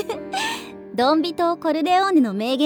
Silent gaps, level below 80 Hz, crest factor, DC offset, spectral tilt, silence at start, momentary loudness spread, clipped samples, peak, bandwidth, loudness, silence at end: none; -64 dBFS; 14 dB; under 0.1%; -4.5 dB/octave; 0 s; 10 LU; under 0.1%; -6 dBFS; 19.5 kHz; -20 LUFS; 0 s